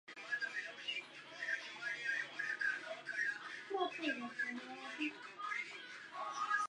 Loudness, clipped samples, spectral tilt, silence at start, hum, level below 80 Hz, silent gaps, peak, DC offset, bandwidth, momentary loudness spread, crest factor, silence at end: -42 LUFS; under 0.1%; -2 dB/octave; 0.05 s; none; under -90 dBFS; none; -24 dBFS; under 0.1%; 10.5 kHz; 8 LU; 18 dB; 0 s